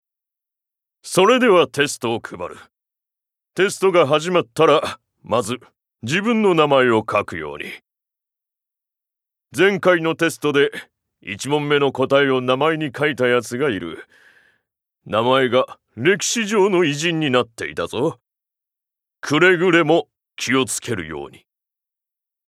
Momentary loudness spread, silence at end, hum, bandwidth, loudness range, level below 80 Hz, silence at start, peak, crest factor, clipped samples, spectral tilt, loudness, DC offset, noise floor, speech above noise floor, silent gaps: 17 LU; 1.2 s; none; 14.5 kHz; 3 LU; -64 dBFS; 1.05 s; 0 dBFS; 20 dB; under 0.1%; -4.5 dB/octave; -18 LUFS; under 0.1%; -84 dBFS; 66 dB; none